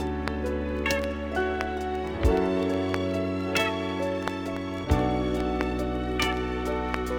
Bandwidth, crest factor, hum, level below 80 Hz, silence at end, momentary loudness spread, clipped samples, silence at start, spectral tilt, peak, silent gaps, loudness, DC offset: over 20 kHz; 20 dB; none; -36 dBFS; 0 s; 5 LU; under 0.1%; 0 s; -6 dB/octave; -8 dBFS; none; -28 LUFS; under 0.1%